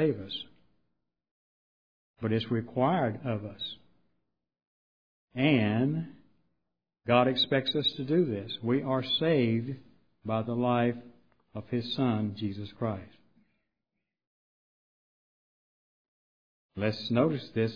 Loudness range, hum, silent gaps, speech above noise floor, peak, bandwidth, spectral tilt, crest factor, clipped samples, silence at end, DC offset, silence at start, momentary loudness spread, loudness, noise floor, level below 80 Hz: 8 LU; none; 1.31-2.14 s, 4.67-5.28 s, 14.27-16.69 s; 58 dB; -10 dBFS; 5.2 kHz; -8 dB/octave; 22 dB; under 0.1%; 0 s; 0.1%; 0 s; 15 LU; -29 LUFS; -87 dBFS; -68 dBFS